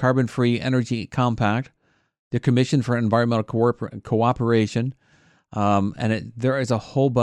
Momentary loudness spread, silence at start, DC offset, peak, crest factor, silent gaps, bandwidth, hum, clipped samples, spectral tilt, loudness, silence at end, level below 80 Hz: 7 LU; 0 s; under 0.1%; -6 dBFS; 16 dB; 2.19-2.31 s; 10 kHz; none; under 0.1%; -7 dB/octave; -22 LUFS; 0 s; -56 dBFS